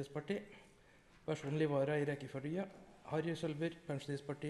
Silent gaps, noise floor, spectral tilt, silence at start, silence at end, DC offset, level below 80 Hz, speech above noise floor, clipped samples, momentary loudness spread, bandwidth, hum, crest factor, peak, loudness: none; -65 dBFS; -7 dB/octave; 0 s; 0 s; under 0.1%; -72 dBFS; 25 dB; under 0.1%; 14 LU; 12 kHz; none; 16 dB; -24 dBFS; -41 LUFS